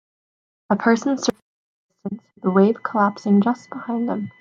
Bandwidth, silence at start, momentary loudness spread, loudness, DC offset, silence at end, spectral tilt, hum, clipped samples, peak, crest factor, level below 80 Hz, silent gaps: 7.4 kHz; 0.7 s; 15 LU; -20 LUFS; under 0.1%; 0.1 s; -6 dB/octave; none; under 0.1%; -2 dBFS; 20 dB; -66 dBFS; 1.42-1.89 s